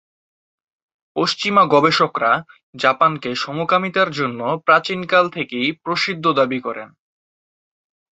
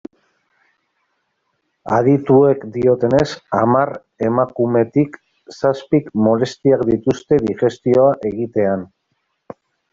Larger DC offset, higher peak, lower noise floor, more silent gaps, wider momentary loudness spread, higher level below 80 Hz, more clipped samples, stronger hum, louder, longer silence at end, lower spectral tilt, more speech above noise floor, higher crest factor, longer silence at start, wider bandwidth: neither; about the same, -2 dBFS vs -2 dBFS; first, under -90 dBFS vs -70 dBFS; first, 2.63-2.73 s vs none; about the same, 9 LU vs 7 LU; second, -64 dBFS vs -52 dBFS; neither; neither; about the same, -18 LUFS vs -17 LUFS; first, 1.35 s vs 1.05 s; second, -5 dB/octave vs -8 dB/octave; first, over 72 dB vs 54 dB; about the same, 18 dB vs 16 dB; second, 1.15 s vs 1.85 s; about the same, 8.2 kHz vs 7.6 kHz